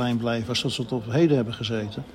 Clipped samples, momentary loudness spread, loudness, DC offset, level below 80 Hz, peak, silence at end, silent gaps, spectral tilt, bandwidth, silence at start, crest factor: under 0.1%; 7 LU; -25 LUFS; under 0.1%; -56 dBFS; -8 dBFS; 0 s; none; -6 dB/octave; 14.5 kHz; 0 s; 16 dB